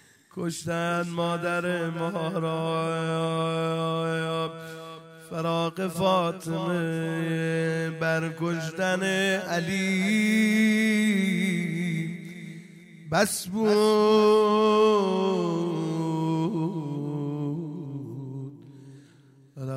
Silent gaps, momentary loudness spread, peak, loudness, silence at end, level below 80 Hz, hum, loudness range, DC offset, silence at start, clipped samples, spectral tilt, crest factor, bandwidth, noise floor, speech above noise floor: none; 16 LU; -10 dBFS; -26 LUFS; 0 s; -68 dBFS; none; 6 LU; under 0.1%; 0.35 s; under 0.1%; -5.5 dB/octave; 16 dB; 16 kHz; -55 dBFS; 31 dB